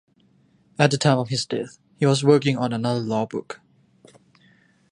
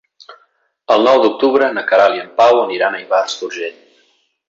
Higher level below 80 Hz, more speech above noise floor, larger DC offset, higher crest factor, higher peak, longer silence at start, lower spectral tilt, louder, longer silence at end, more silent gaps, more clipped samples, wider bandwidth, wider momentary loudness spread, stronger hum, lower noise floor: about the same, -64 dBFS vs -64 dBFS; second, 39 dB vs 46 dB; neither; first, 22 dB vs 14 dB; about the same, 0 dBFS vs 0 dBFS; first, 0.8 s vs 0.3 s; first, -5.5 dB/octave vs -3.5 dB/octave; second, -22 LUFS vs -14 LUFS; first, 1.35 s vs 0.8 s; neither; neither; first, 11 kHz vs 7.8 kHz; first, 19 LU vs 11 LU; neither; about the same, -60 dBFS vs -59 dBFS